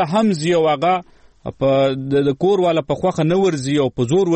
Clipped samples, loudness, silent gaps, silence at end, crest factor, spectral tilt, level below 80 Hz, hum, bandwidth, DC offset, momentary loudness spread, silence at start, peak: under 0.1%; -17 LUFS; none; 0 s; 10 dB; -6.5 dB/octave; -50 dBFS; none; 8.8 kHz; under 0.1%; 4 LU; 0 s; -6 dBFS